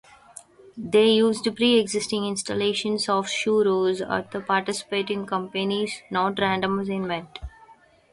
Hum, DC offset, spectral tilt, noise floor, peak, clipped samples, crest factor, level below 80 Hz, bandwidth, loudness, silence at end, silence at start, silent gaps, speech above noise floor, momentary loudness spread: none; under 0.1%; -4 dB/octave; -54 dBFS; -8 dBFS; under 0.1%; 16 dB; -54 dBFS; 11.5 kHz; -24 LUFS; 0.4 s; 0.75 s; none; 30 dB; 8 LU